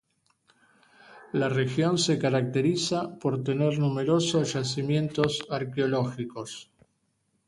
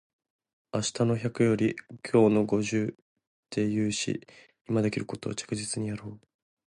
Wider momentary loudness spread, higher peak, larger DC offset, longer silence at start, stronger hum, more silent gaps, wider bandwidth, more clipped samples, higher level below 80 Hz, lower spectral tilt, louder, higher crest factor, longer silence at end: second, 8 LU vs 12 LU; about the same, -8 dBFS vs -10 dBFS; neither; first, 1.1 s vs 0.75 s; neither; second, none vs 3.02-3.16 s, 3.27-3.43 s, 4.61-4.65 s; about the same, 11.5 kHz vs 11.5 kHz; neither; about the same, -64 dBFS vs -62 dBFS; about the same, -5.5 dB/octave vs -5.5 dB/octave; about the same, -27 LUFS vs -28 LUFS; about the same, 20 dB vs 20 dB; first, 0.85 s vs 0.55 s